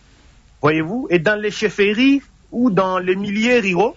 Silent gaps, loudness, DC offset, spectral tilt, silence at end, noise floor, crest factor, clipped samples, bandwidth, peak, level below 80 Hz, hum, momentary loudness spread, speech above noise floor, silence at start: none; -17 LUFS; under 0.1%; -5.5 dB/octave; 0.05 s; -49 dBFS; 14 dB; under 0.1%; 7.8 kHz; -2 dBFS; -50 dBFS; none; 6 LU; 32 dB; 0.65 s